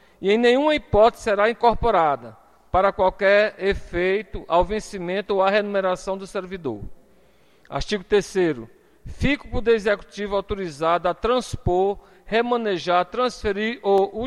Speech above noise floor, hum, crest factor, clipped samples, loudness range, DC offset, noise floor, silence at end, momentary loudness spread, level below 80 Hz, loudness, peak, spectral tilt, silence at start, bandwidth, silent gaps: 36 dB; none; 18 dB; under 0.1%; 6 LU; 0.1%; -58 dBFS; 0 s; 11 LU; -40 dBFS; -22 LUFS; -4 dBFS; -5.5 dB/octave; 0.2 s; 12.5 kHz; none